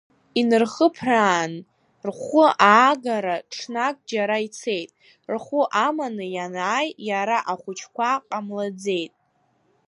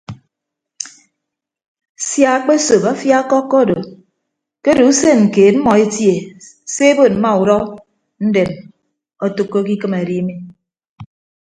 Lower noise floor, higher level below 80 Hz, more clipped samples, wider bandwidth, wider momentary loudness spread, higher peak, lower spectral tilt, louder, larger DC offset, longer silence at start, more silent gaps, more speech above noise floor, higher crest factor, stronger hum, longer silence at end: second, -66 dBFS vs -80 dBFS; second, -74 dBFS vs -52 dBFS; neither; about the same, 11 kHz vs 10 kHz; second, 14 LU vs 18 LU; about the same, 0 dBFS vs 0 dBFS; about the same, -4 dB/octave vs -5 dB/octave; second, -22 LUFS vs -14 LUFS; neither; first, 0.35 s vs 0.1 s; second, none vs 1.68-1.75 s, 1.89-1.95 s, 10.89-10.96 s; second, 44 dB vs 68 dB; first, 22 dB vs 16 dB; neither; first, 0.8 s vs 0.35 s